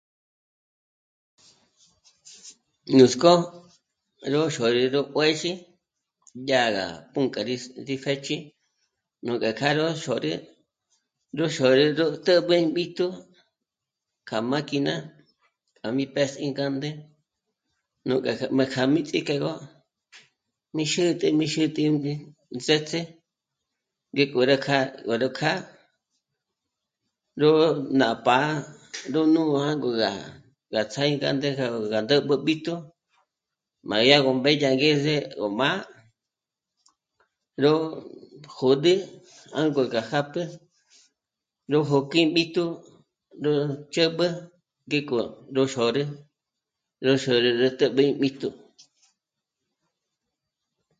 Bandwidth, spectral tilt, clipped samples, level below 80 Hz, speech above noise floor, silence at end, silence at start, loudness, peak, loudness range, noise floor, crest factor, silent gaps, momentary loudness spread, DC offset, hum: 9.4 kHz; -5 dB/octave; under 0.1%; -70 dBFS; 64 dB; 2.45 s; 2.25 s; -24 LUFS; 0 dBFS; 6 LU; -88 dBFS; 24 dB; none; 14 LU; under 0.1%; none